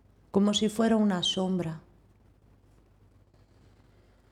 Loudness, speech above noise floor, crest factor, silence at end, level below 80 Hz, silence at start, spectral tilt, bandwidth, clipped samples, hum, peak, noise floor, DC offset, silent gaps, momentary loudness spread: -27 LUFS; 34 dB; 20 dB; 2.55 s; -62 dBFS; 0.35 s; -5 dB/octave; 13 kHz; under 0.1%; none; -12 dBFS; -60 dBFS; under 0.1%; none; 9 LU